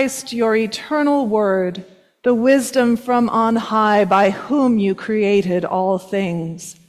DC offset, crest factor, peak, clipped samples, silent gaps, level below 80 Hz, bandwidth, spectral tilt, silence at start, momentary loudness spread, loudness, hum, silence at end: under 0.1%; 14 dB; -4 dBFS; under 0.1%; none; -60 dBFS; 14.5 kHz; -5.5 dB/octave; 0 s; 7 LU; -17 LUFS; none; 0.15 s